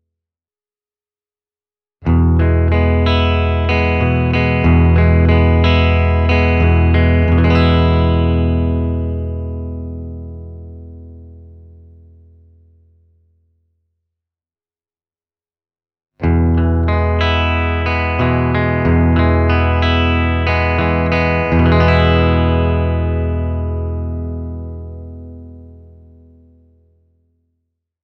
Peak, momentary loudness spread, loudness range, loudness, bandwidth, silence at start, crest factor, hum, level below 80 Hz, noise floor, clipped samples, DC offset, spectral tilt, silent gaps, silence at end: 0 dBFS; 16 LU; 15 LU; -14 LUFS; 5.6 kHz; 2 s; 16 dB; none; -22 dBFS; under -90 dBFS; under 0.1%; under 0.1%; -9 dB/octave; none; 2.25 s